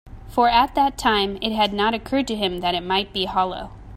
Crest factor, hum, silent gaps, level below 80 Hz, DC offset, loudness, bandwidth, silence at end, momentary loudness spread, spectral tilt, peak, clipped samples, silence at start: 18 dB; none; none; -42 dBFS; under 0.1%; -21 LUFS; 16 kHz; 0 s; 6 LU; -4.5 dB/octave; -4 dBFS; under 0.1%; 0.05 s